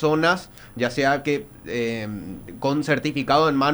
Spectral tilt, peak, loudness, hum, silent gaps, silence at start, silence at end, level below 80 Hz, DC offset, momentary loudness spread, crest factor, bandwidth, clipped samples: -5.5 dB/octave; -4 dBFS; -23 LUFS; none; none; 0 s; 0 s; -50 dBFS; under 0.1%; 13 LU; 18 dB; over 20 kHz; under 0.1%